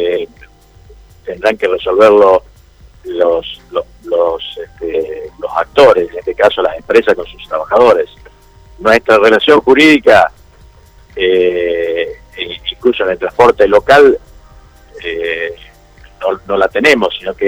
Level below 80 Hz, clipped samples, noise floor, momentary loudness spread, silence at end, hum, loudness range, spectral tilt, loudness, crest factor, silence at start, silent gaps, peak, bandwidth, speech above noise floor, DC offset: -42 dBFS; 0.6%; -41 dBFS; 15 LU; 0 s; none; 5 LU; -4.5 dB/octave; -11 LUFS; 12 dB; 0 s; none; 0 dBFS; over 20 kHz; 31 dB; under 0.1%